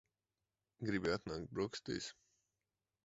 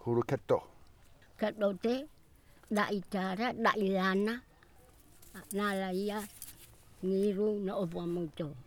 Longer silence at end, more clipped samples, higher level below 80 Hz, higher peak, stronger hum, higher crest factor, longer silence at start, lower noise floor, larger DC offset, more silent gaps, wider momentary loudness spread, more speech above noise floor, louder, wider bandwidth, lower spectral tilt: first, 0.95 s vs 0 s; neither; about the same, -66 dBFS vs -64 dBFS; second, -24 dBFS vs -14 dBFS; neither; about the same, 20 dB vs 20 dB; first, 0.8 s vs 0 s; first, under -90 dBFS vs -60 dBFS; neither; neither; second, 7 LU vs 11 LU; first, over 49 dB vs 27 dB; second, -42 LUFS vs -34 LUFS; second, 7.6 kHz vs over 20 kHz; second, -4.5 dB/octave vs -6 dB/octave